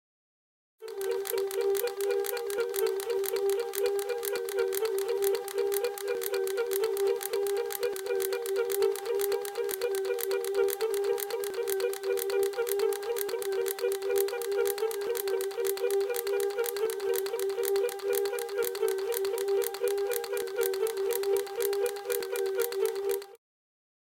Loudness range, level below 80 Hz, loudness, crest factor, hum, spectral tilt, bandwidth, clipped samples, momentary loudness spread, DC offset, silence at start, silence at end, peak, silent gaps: 1 LU; -76 dBFS; -30 LUFS; 20 dB; none; -1 dB/octave; 17 kHz; under 0.1%; 3 LU; under 0.1%; 0.8 s; 0.7 s; -12 dBFS; none